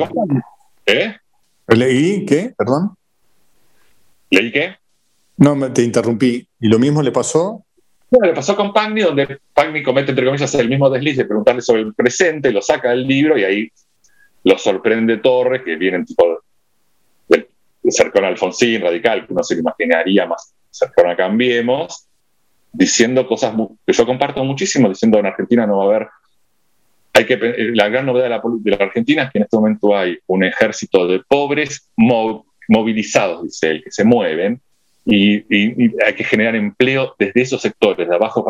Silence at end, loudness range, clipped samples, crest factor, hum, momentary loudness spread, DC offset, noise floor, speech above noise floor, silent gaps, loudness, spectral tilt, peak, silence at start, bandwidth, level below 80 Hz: 0 s; 2 LU; under 0.1%; 16 dB; none; 6 LU; under 0.1%; -67 dBFS; 52 dB; none; -15 LUFS; -5 dB/octave; 0 dBFS; 0 s; 14 kHz; -56 dBFS